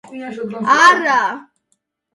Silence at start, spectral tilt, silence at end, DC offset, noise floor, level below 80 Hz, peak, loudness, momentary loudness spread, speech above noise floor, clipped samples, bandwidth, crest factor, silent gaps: 0.1 s; -2.5 dB/octave; 0.75 s; under 0.1%; -68 dBFS; -68 dBFS; 0 dBFS; -13 LUFS; 19 LU; 53 dB; under 0.1%; 11.5 kHz; 16 dB; none